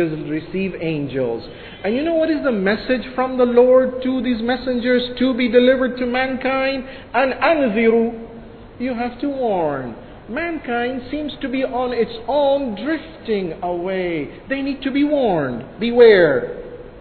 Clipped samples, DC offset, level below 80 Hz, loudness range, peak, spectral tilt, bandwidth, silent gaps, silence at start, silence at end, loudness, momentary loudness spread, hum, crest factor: under 0.1%; under 0.1%; -46 dBFS; 6 LU; 0 dBFS; -9.5 dB/octave; 4.6 kHz; none; 0 s; 0 s; -19 LUFS; 12 LU; none; 18 dB